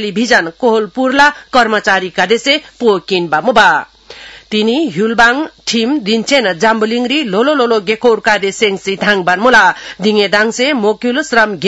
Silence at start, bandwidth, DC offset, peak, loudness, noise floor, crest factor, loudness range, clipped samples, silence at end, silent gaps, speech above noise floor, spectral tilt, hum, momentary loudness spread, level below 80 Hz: 0 s; 12 kHz; under 0.1%; 0 dBFS; -11 LUFS; -34 dBFS; 12 dB; 1 LU; 0.4%; 0 s; none; 23 dB; -3.5 dB/octave; none; 6 LU; -48 dBFS